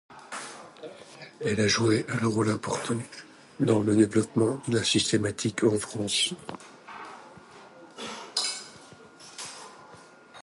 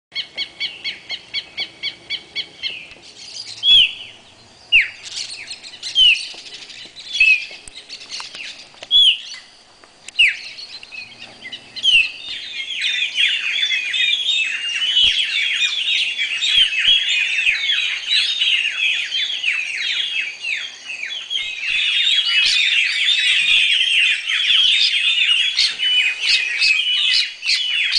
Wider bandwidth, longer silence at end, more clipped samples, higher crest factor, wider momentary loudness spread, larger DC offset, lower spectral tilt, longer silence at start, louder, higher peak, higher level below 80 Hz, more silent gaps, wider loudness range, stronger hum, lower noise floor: first, 11.5 kHz vs 10 kHz; about the same, 0 s vs 0 s; neither; about the same, 20 dB vs 16 dB; about the same, 21 LU vs 19 LU; neither; first, -4.5 dB/octave vs 3 dB/octave; about the same, 0.1 s vs 0.15 s; second, -26 LUFS vs -15 LUFS; second, -8 dBFS vs -2 dBFS; about the same, -60 dBFS vs -56 dBFS; neither; first, 11 LU vs 6 LU; neither; first, -51 dBFS vs -47 dBFS